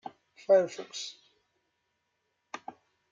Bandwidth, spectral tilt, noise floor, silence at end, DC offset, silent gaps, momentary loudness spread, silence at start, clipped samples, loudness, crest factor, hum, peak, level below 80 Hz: 7.6 kHz; -3.5 dB/octave; -79 dBFS; 0.4 s; under 0.1%; none; 22 LU; 0.05 s; under 0.1%; -28 LUFS; 22 dB; none; -12 dBFS; -86 dBFS